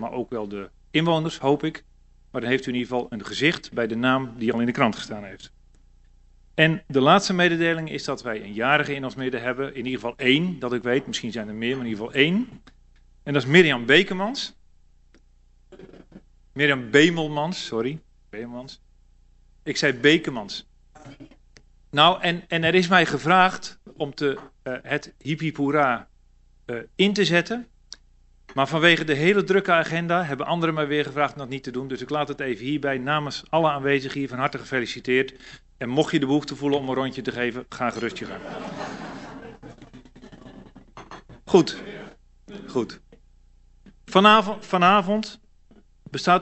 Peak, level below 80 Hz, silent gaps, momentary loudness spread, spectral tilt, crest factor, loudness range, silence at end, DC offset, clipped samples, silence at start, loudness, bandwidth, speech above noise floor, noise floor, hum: 0 dBFS; -54 dBFS; none; 17 LU; -5 dB/octave; 24 dB; 7 LU; 0 s; under 0.1%; under 0.1%; 0 s; -22 LUFS; 8.2 kHz; 34 dB; -57 dBFS; none